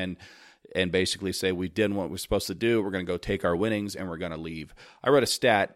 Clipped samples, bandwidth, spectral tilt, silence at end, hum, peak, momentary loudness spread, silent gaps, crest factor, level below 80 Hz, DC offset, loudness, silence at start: under 0.1%; 16 kHz; -4.5 dB/octave; 0.05 s; none; -8 dBFS; 13 LU; none; 20 dB; -50 dBFS; under 0.1%; -27 LUFS; 0 s